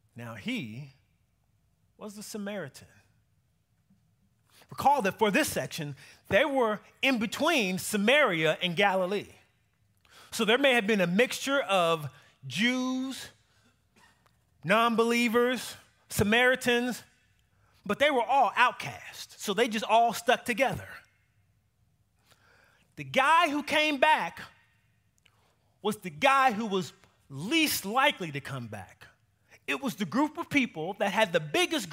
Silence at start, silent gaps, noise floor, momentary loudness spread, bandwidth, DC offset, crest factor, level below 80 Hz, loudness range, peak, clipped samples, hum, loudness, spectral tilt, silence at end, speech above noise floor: 0.15 s; none; -72 dBFS; 19 LU; 16 kHz; under 0.1%; 22 dB; -64 dBFS; 5 LU; -8 dBFS; under 0.1%; none; -27 LUFS; -4 dB/octave; 0 s; 44 dB